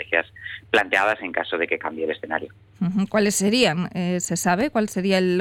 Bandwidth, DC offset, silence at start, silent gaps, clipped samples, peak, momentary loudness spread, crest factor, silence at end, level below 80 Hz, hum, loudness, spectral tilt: 17 kHz; under 0.1%; 0 s; none; under 0.1%; -6 dBFS; 10 LU; 16 dB; 0 s; -58 dBFS; none; -22 LUFS; -4 dB/octave